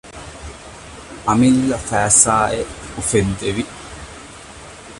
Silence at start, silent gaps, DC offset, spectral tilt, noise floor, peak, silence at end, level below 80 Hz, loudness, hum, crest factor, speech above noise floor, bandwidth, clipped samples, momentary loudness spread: 0.05 s; none; under 0.1%; -4 dB/octave; -37 dBFS; 0 dBFS; 0 s; -40 dBFS; -16 LUFS; none; 20 dB; 21 dB; 11.5 kHz; under 0.1%; 24 LU